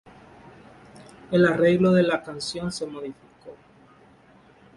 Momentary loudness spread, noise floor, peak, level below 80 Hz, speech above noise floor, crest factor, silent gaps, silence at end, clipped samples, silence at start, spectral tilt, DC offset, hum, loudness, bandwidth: 15 LU; -54 dBFS; -6 dBFS; -58 dBFS; 32 dB; 18 dB; none; 1.2 s; under 0.1%; 0.95 s; -6 dB/octave; under 0.1%; none; -22 LUFS; 11.5 kHz